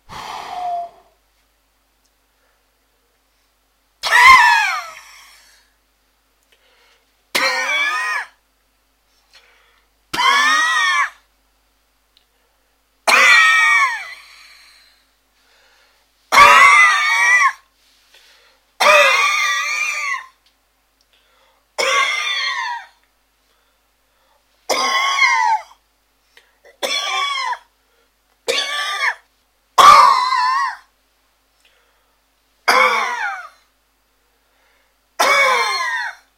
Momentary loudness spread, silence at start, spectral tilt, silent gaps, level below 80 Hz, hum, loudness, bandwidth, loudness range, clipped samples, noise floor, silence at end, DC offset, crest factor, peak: 19 LU; 0.1 s; 1 dB/octave; none; -56 dBFS; none; -13 LUFS; 16 kHz; 10 LU; under 0.1%; -62 dBFS; 0.25 s; under 0.1%; 18 dB; 0 dBFS